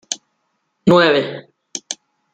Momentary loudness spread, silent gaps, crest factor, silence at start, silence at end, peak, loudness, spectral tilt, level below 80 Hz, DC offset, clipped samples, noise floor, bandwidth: 19 LU; none; 18 dB; 0.1 s; 0.4 s; -2 dBFS; -16 LUFS; -4.5 dB/octave; -58 dBFS; under 0.1%; under 0.1%; -70 dBFS; 9.6 kHz